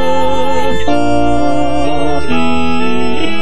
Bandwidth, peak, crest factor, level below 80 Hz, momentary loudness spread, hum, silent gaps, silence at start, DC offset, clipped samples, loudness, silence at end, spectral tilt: 11 kHz; 0 dBFS; 12 dB; -30 dBFS; 3 LU; none; none; 0 s; 40%; under 0.1%; -15 LUFS; 0 s; -5.5 dB/octave